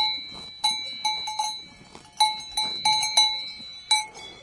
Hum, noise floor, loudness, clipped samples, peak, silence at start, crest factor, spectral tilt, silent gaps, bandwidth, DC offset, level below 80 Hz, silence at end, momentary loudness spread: none; -48 dBFS; -24 LUFS; under 0.1%; -6 dBFS; 0 s; 20 dB; 1.5 dB/octave; none; 11.5 kHz; under 0.1%; -62 dBFS; 0 s; 17 LU